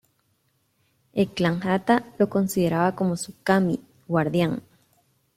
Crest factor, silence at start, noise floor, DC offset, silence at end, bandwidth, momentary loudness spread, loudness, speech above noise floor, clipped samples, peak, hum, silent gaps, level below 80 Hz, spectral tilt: 20 dB; 1.15 s; -69 dBFS; under 0.1%; 0.75 s; 15.5 kHz; 6 LU; -24 LUFS; 46 dB; under 0.1%; -6 dBFS; none; none; -60 dBFS; -6.5 dB/octave